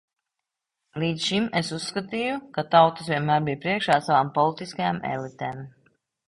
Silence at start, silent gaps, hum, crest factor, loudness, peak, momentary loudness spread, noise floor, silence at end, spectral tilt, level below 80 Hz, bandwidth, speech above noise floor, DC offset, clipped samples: 0.95 s; none; none; 22 dB; -24 LUFS; -4 dBFS; 12 LU; -85 dBFS; 0.6 s; -5 dB/octave; -62 dBFS; 11.5 kHz; 61 dB; under 0.1%; under 0.1%